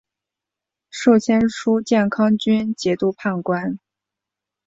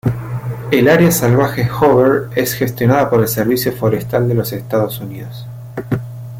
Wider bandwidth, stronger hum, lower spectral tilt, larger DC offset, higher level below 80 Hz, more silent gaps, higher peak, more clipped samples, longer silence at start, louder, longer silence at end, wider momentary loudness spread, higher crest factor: second, 7.8 kHz vs 17 kHz; neither; about the same, -6 dB/octave vs -6 dB/octave; neither; second, -56 dBFS vs -44 dBFS; neither; second, -4 dBFS vs 0 dBFS; neither; first, 0.95 s vs 0.05 s; second, -19 LUFS vs -15 LUFS; first, 0.9 s vs 0 s; second, 8 LU vs 15 LU; about the same, 16 dB vs 14 dB